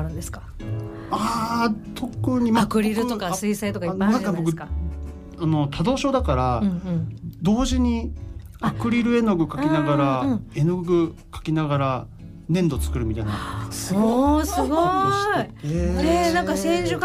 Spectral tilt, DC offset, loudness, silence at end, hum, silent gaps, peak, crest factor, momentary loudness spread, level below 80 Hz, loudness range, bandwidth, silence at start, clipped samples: -6 dB/octave; under 0.1%; -23 LUFS; 0 s; none; none; -10 dBFS; 14 dB; 12 LU; -34 dBFS; 3 LU; 15.5 kHz; 0 s; under 0.1%